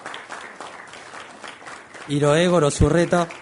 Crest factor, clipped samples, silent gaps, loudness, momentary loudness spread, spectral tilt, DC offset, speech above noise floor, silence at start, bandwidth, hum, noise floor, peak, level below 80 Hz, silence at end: 18 dB; under 0.1%; none; -19 LUFS; 21 LU; -5.5 dB/octave; under 0.1%; 22 dB; 0 s; 11 kHz; none; -40 dBFS; -4 dBFS; -38 dBFS; 0 s